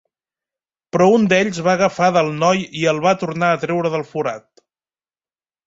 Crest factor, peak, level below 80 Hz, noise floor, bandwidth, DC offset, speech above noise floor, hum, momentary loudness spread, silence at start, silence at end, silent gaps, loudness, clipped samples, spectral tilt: 16 dB; -2 dBFS; -60 dBFS; under -90 dBFS; 8 kHz; under 0.1%; over 73 dB; none; 10 LU; 0.95 s; 1.3 s; none; -17 LUFS; under 0.1%; -5.5 dB/octave